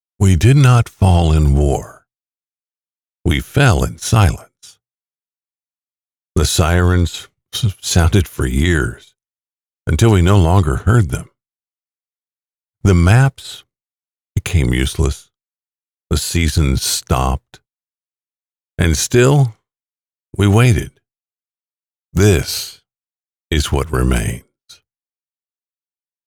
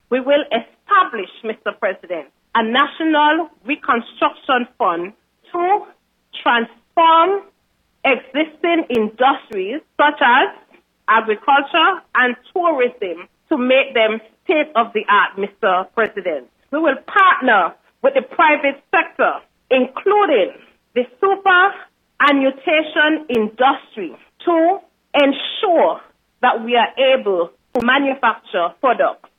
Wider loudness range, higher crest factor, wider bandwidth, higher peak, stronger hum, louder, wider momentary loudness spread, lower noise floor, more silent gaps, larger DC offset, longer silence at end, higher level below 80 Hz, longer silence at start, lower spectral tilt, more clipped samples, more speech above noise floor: about the same, 4 LU vs 2 LU; about the same, 14 dB vs 14 dB; first, 17.5 kHz vs 5.6 kHz; about the same, -2 dBFS vs -2 dBFS; neither; about the same, -15 LUFS vs -17 LUFS; about the same, 13 LU vs 11 LU; first, under -90 dBFS vs -64 dBFS; first, 2.46-2.50 s, 3.20-3.24 s, 5.78-5.82 s, 6.05-6.09 s, 12.57-12.61 s vs none; neither; first, 1.85 s vs 0.25 s; first, -26 dBFS vs -66 dBFS; about the same, 0.2 s vs 0.1 s; about the same, -5.5 dB/octave vs -5.5 dB/octave; neither; first, over 77 dB vs 48 dB